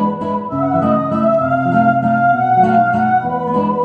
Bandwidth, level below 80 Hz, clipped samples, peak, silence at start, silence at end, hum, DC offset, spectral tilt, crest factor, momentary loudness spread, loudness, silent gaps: 5 kHz; -52 dBFS; under 0.1%; -2 dBFS; 0 s; 0 s; none; under 0.1%; -9.5 dB/octave; 12 dB; 6 LU; -14 LUFS; none